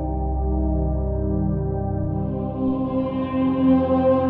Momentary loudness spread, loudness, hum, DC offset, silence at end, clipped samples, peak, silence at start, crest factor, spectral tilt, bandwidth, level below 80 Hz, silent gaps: 7 LU; -23 LUFS; none; under 0.1%; 0 s; under 0.1%; -6 dBFS; 0 s; 14 dB; -12.5 dB/octave; 4.1 kHz; -28 dBFS; none